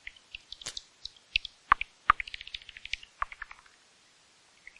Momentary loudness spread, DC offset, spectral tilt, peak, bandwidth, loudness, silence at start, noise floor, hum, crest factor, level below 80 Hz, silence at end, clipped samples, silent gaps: 18 LU; under 0.1%; -0.5 dB/octave; -6 dBFS; 11.5 kHz; -32 LUFS; 0.65 s; -62 dBFS; none; 30 dB; -54 dBFS; 1.35 s; under 0.1%; none